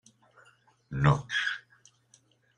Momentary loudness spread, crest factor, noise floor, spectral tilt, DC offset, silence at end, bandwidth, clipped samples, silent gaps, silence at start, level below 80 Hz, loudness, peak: 15 LU; 26 dB; -65 dBFS; -6 dB/octave; under 0.1%; 1 s; 9.4 kHz; under 0.1%; none; 0.9 s; -54 dBFS; -29 LUFS; -8 dBFS